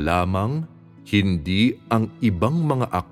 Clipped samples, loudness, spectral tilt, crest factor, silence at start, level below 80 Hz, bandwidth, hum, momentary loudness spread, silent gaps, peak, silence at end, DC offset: under 0.1%; -22 LUFS; -7 dB/octave; 16 dB; 0 s; -44 dBFS; 15 kHz; none; 5 LU; none; -4 dBFS; 0.05 s; under 0.1%